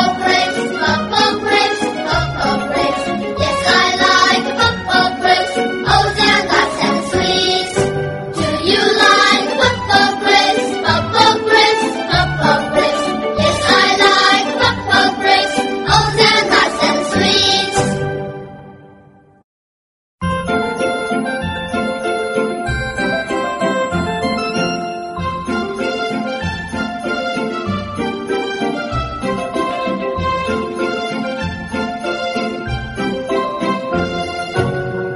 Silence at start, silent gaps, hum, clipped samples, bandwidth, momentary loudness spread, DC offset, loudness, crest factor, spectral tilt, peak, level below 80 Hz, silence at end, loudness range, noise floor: 0 s; 19.44-20.18 s; none; under 0.1%; 11.5 kHz; 10 LU; under 0.1%; -15 LUFS; 16 dB; -4 dB/octave; 0 dBFS; -38 dBFS; 0 s; 8 LU; -46 dBFS